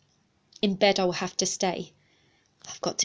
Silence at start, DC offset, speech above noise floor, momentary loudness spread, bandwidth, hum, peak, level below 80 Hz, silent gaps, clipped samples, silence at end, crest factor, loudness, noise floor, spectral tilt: 0.65 s; under 0.1%; 41 dB; 20 LU; 8 kHz; none; -8 dBFS; -66 dBFS; none; under 0.1%; 0 s; 22 dB; -26 LUFS; -68 dBFS; -3 dB/octave